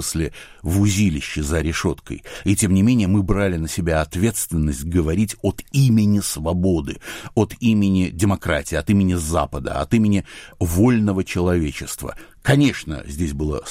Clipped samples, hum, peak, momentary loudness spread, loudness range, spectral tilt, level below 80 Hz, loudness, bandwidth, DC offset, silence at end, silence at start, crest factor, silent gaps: under 0.1%; none; -2 dBFS; 10 LU; 1 LU; -6 dB/octave; -34 dBFS; -20 LUFS; 16 kHz; under 0.1%; 0 s; 0 s; 16 dB; none